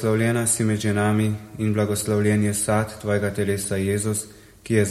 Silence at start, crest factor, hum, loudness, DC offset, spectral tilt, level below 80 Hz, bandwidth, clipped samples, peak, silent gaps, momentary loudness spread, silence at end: 0 s; 16 dB; none; -22 LUFS; under 0.1%; -5.5 dB/octave; -52 dBFS; 14 kHz; under 0.1%; -6 dBFS; none; 5 LU; 0 s